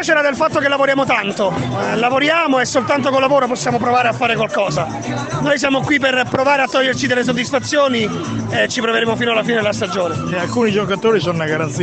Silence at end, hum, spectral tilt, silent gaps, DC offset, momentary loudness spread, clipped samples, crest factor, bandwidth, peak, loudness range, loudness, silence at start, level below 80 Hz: 0 s; none; -4.5 dB/octave; none; under 0.1%; 5 LU; under 0.1%; 14 dB; 9 kHz; -2 dBFS; 2 LU; -16 LUFS; 0 s; -50 dBFS